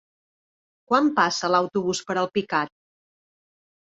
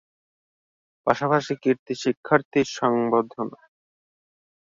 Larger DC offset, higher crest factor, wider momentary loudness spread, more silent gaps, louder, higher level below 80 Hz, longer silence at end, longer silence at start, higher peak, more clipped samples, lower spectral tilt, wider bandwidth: neither; about the same, 22 dB vs 22 dB; second, 6 LU vs 9 LU; second, none vs 1.79-1.86 s, 2.17-2.23 s, 2.45-2.51 s; about the same, -23 LUFS vs -24 LUFS; about the same, -68 dBFS vs -64 dBFS; about the same, 1.3 s vs 1.3 s; second, 0.9 s vs 1.05 s; about the same, -4 dBFS vs -2 dBFS; neither; second, -4 dB/octave vs -5.5 dB/octave; about the same, 8.4 kHz vs 7.8 kHz